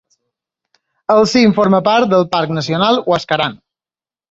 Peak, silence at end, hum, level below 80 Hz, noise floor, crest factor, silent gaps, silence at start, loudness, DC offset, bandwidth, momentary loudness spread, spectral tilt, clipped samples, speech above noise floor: 0 dBFS; 0.75 s; none; -54 dBFS; under -90 dBFS; 14 dB; none; 1.1 s; -13 LUFS; under 0.1%; 8 kHz; 7 LU; -5.5 dB/octave; under 0.1%; over 77 dB